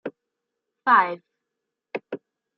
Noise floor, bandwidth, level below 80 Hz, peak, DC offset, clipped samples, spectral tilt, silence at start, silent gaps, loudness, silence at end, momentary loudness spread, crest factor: -83 dBFS; 5.8 kHz; -86 dBFS; -4 dBFS; under 0.1%; under 0.1%; -1.5 dB/octave; 0.05 s; none; -20 LUFS; 0.4 s; 20 LU; 22 dB